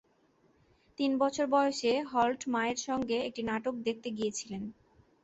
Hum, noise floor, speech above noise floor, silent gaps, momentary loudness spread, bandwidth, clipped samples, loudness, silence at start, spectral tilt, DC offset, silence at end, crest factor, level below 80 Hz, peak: none; -68 dBFS; 37 dB; none; 10 LU; 8.2 kHz; under 0.1%; -32 LUFS; 1 s; -3.5 dB/octave; under 0.1%; 0.5 s; 18 dB; -68 dBFS; -16 dBFS